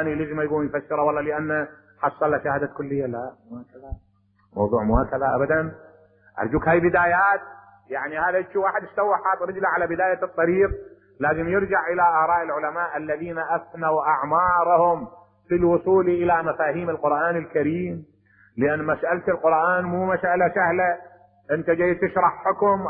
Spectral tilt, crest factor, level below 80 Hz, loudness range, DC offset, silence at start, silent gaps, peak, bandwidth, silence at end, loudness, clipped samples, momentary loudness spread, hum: -12 dB/octave; 16 dB; -44 dBFS; 5 LU; under 0.1%; 0 s; none; -6 dBFS; 3.9 kHz; 0 s; -22 LUFS; under 0.1%; 11 LU; none